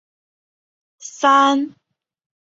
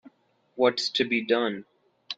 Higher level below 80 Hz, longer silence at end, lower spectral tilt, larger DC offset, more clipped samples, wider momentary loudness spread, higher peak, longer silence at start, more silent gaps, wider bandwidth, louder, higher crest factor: about the same, -72 dBFS vs -70 dBFS; first, 0.85 s vs 0.05 s; second, -1.5 dB/octave vs -3.5 dB/octave; neither; neither; first, 23 LU vs 13 LU; first, -2 dBFS vs -8 dBFS; first, 1.05 s vs 0.55 s; neither; second, 7.8 kHz vs 9.2 kHz; first, -16 LUFS vs -25 LUFS; about the same, 20 dB vs 20 dB